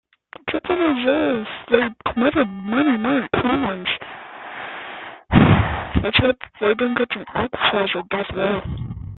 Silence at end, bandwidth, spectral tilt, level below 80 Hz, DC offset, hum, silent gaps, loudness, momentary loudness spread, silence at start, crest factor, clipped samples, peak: 0 s; 4.4 kHz; -11 dB/octave; -38 dBFS; under 0.1%; none; none; -20 LUFS; 14 LU; 0.45 s; 18 dB; under 0.1%; -2 dBFS